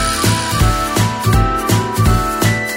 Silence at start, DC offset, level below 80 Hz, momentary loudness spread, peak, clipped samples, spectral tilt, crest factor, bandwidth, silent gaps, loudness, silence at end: 0 s; under 0.1%; -22 dBFS; 1 LU; -2 dBFS; under 0.1%; -4.5 dB/octave; 14 dB; 16.5 kHz; none; -15 LUFS; 0 s